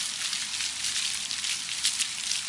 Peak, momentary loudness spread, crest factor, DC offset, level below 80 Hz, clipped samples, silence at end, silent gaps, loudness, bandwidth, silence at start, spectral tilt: -10 dBFS; 3 LU; 22 dB; under 0.1%; -66 dBFS; under 0.1%; 0 s; none; -27 LUFS; 11.5 kHz; 0 s; 2.5 dB/octave